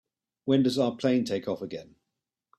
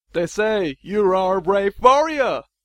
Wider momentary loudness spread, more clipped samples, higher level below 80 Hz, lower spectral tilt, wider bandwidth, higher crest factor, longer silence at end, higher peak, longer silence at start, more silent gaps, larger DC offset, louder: first, 14 LU vs 8 LU; neither; second, -68 dBFS vs -48 dBFS; first, -6.5 dB/octave vs -5 dB/octave; about the same, 13 kHz vs 12 kHz; about the same, 18 dB vs 18 dB; first, 0.75 s vs 0.25 s; second, -12 dBFS vs 0 dBFS; first, 0.45 s vs 0.15 s; neither; neither; second, -27 LUFS vs -19 LUFS